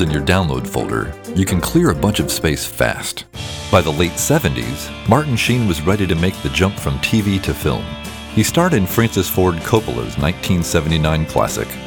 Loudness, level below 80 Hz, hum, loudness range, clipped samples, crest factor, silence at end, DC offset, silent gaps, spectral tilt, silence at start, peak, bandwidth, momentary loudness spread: -17 LUFS; -34 dBFS; none; 1 LU; under 0.1%; 16 dB; 0 s; under 0.1%; none; -5 dB/octave; 0 s; 0 dBFS; over 20 kHz; 8 LU